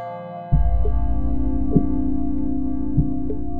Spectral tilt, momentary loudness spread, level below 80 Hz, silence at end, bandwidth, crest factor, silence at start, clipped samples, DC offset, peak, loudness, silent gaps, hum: -13.5 dB/octave; 4 LU; -24 dBFS; 0 s; 3.2 kHz; 18 dB; 0 s; under 0.1%; 9%; -2 dBFS; -23 LUFS; none; none